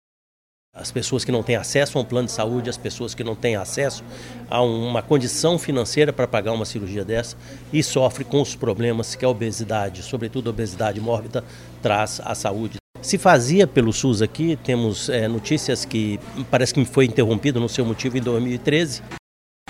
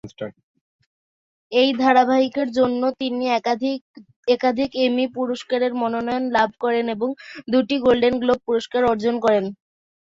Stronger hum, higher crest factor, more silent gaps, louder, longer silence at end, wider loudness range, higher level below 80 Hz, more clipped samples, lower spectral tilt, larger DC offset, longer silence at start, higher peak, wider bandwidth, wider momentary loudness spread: neither; about the same, 18 dB vs 18 dB; second, 12.80-12.94 s vs 0.43-0.54 s, 0.61-0.79 s, 0.86-1.50 s, 3.81-3.94 s, 4.16-4.23 s; about the same, -22 LUFS vs -20 LUFS; about the same, 0.5 s vs 0.55 s; first, 5 LU vs 2 LU; first, -48 dBFS vs -58 dBFS; neither; about the same, -5 dB/octave vs -5.5 dB/octave; neither; first, 0.75 s vs 0.05 s; about the same, -4 dBFS vs -4 dBFS; first, 16 kHz vs 7.6 kHz; about the same, 11 LU vs 9 LU